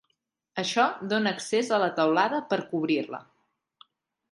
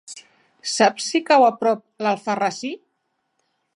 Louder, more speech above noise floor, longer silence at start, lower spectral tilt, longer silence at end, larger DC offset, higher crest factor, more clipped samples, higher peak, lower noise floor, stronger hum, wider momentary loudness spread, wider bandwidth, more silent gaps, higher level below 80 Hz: second, -26 LUFS vs -20 LUFS; about the same, 51 dB vs 54 dB; first, 0.55 s vs 0.1 s; about the same, -4 dB/octave vs -3 dB/octave; about the same, 1.1 s vs 1 s; neither; about the same, 18 dB vs 18 dB; neither; second, -10 dBFS vs -4 dBFS; first, -77 dBFS vs -73 dBFS; neither; second, 9 LU vs 19 LU; about the same, 11.5 kHz vs 11.5 kHz; neither; about the same, -78 dBFS vs -80 dBFS